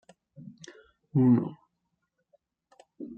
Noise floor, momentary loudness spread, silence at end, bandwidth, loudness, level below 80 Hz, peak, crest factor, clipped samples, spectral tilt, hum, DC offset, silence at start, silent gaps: -80 dBFS; 27 LU; 0.05 s; 7.8 kHz; -26 LUFS; -66 dBFS; -12 dBFS; 20 dB; under 0.1%; -9.5 dB/octave; none; under 0.1%; 0.45 s; none